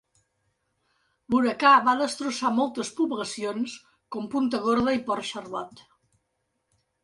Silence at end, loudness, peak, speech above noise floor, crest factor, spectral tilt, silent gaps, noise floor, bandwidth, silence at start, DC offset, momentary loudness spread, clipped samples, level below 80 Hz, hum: 1.25 s; -25 LUFS; -6 dBFS; 52 dB; 20 dB; -4 dB/octave; none; -77 dBFS; 11.5 kHz; 1.3 s; under 0.1%; 17 LU; under 0.1%; -62 dBFS; none